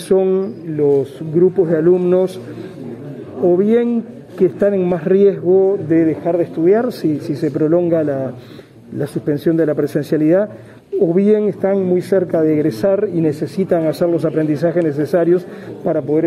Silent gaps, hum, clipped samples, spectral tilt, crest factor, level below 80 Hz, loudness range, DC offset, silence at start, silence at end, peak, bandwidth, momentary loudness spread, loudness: none; none; under 0.1%; -8.5 dB/octave; 14 dB; -58 dBFS; 3 LU; under 0.1%; 0 s; 0 s; -2 dBFS; 13 kHz; 11 LU; -16 LUFS